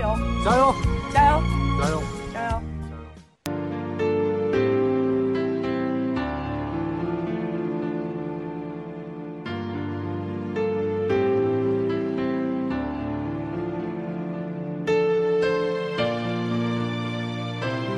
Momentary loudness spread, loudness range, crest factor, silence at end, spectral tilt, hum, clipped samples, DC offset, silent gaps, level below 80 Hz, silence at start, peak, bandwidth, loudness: 10 LU; 5 LU; 20 dB; 0 s; -7 dB/octave; none; under 0.1%; under 0.1%; none; -38 dBFS; 0 s; -4 dBFS; 12 kHz; -25 LUFS